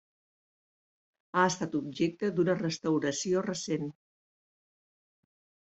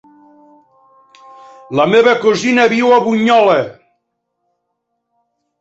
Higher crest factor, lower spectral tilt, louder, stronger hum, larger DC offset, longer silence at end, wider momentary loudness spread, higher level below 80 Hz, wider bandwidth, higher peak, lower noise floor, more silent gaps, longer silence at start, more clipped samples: first, 22 dB vs 14 dB; about the same, -5 dB/octave vs -5 dB/octave; second, -31 LUFS vs -12 LUFS; neither; neither; about the same, 1.85 s vs 1.9 s; about the same, 6 LU vs 6 LU; second, -72 dBFS vs -60 dBFS; about the same, 8.2 kHz vs 8 kHz; second, -12 dBFS vs -2 dBFS; first, under -90 dBFS vs -71 dBFS; neither; second, 1.35 s vs 1.7 s; neither